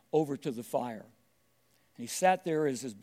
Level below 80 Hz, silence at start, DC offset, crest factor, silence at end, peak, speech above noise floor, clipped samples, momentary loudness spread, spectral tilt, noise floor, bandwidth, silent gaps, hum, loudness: -86 dBFS; 0.15 s; under 0.1%; 20 dB; 0.05 s; -12 dBFS; 40 dB; under 0.1%; 13 LU; -4.5 dB/octave; -72 dBFS; 16 kHz; none; none; -32 LUFS